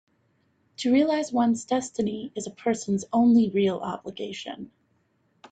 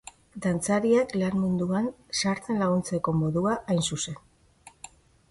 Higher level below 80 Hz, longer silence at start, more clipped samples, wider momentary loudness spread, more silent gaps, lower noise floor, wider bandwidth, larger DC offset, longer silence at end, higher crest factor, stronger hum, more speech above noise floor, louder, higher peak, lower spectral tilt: second, -68 dBFS vs -56 dBFS; first, 0.8 s vs 0.35 s; neither; second, 15 LU vs 20 LU; neither; first, -69 dBFS vs -55 dBFS; second, 9.2 kHz vs 11.5 kHz; neither; first, 0.85 s vs 0.6 s; about the same, 16 dB vs 16 dB; neither; first, 44 dB vs 29 dB; about the same, -25 LUFS vs -27 LUFS; about the same, -10 dBFS vs -10 dBFS; about the same, -5.5 dB/octave vs -5.5 dB/octave